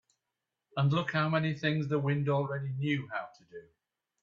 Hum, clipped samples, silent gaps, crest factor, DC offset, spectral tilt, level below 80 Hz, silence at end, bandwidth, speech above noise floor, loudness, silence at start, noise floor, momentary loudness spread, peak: none; under 0.1%; none; 18 dB; under 0.1%; -8 dB/octave; -70 dBFS; 0.6 s; 7 kHz; 56 dB; -31 LUFS; 0.75 s; -87 dBFS; 17 LU; -14 dBFS